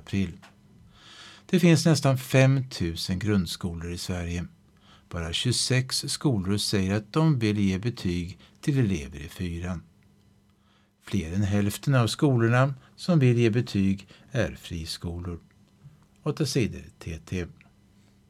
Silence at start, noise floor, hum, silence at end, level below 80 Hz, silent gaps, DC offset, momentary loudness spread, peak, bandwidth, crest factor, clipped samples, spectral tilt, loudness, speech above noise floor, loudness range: 0.1 s; -63 dBFS; none; 0.75 s; -50 dBFS; none; under 0.1%; 15 LU; -8 dBFS; 14.5 kHz; 18 dB; under 0.1%; -5.5 dB/octave; -26 LUFS; 38 dB; 8 LU